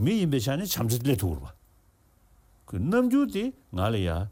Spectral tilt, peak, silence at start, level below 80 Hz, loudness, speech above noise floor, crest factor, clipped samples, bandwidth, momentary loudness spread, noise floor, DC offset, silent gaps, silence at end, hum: -6 dB/octave; -12 dBFS; 0 s; -46 dBFS; -27 LUFS; 36 dB; 16 dB; under 0.1%; 16.5 kHz; 9 LU; -62 dBFS; under 0.1%; none; 0 s; none